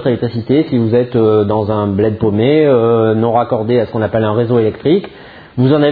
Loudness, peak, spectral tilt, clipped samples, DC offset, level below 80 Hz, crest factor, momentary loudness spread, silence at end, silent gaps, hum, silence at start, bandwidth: -13 LUFS; 0 dBFS; -11.5 dB/octave; under 0.1%; under 0.1%; -46 dBFS; 12 dB; 5 LU; 0 s; none; none; 0 s; 4.9 kHz